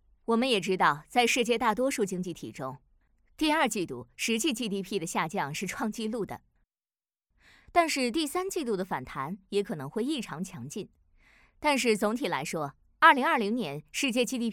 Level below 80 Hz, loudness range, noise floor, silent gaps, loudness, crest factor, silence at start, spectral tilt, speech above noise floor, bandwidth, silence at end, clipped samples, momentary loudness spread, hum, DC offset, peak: -62 dBFS; 6 LU; under -90 dBFS; none; -29 LUFS; 24 dB; 0.3 s; -3.5 dB/octave; over 61 dB; 18 kHz; 0 s; under 0.1%; 13 LU; none; under 0.1%; -6 dBFS